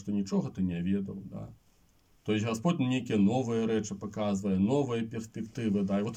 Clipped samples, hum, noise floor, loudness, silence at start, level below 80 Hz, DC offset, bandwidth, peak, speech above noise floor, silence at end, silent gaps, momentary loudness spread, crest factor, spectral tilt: under 0.1%; none; -66 dBFS; -31 LUFS; 0 s; -66 dBFS; under 0.1%; 9.4 kHz; -16 dBFS; 36 dB; 0 s; none; 12 LU; 14 dB; -7 dB/octave